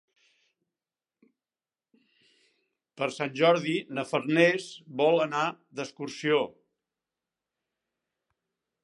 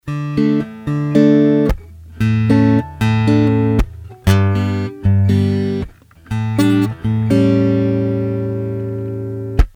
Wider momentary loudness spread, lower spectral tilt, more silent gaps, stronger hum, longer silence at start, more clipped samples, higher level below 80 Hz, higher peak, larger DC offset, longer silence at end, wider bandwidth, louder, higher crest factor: first, 14 LU vs 10 LU; second, -5 dB/octave vs -8 dB/octave; neither; neither; first, 3 s vs 0.05 s; neither; second, -84 dBFS vs -28 dBFS; second, -6 dBFS vs 0 dBFS; neither; first, 2.35 s vs 0.05 s; second, 11.5 kHz vs 13 kHz; second, -27 LUFS vs -16 LUFS; first, 24 dB vs 14 dB